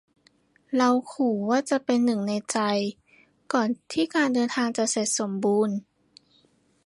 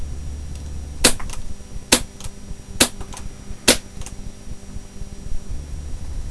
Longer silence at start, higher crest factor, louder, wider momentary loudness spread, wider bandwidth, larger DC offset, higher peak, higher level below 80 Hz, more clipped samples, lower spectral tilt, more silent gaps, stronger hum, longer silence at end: first, 0.7 s vs 0 s; second, 18 dB vs 24 dB; second, -25 LUFS vs -18 LUFS; second, 5 LU vs 21 LU; about the same, 11.5 kHz vs 11 kHz; neither; second, -8 dBFS vs 0 dBFS; second, -72 dBFS vs -32 dBFS; neither; first, -4 dB/octave vs -2 dB/octave; neither; neither; first, 1.05 s vs 0 s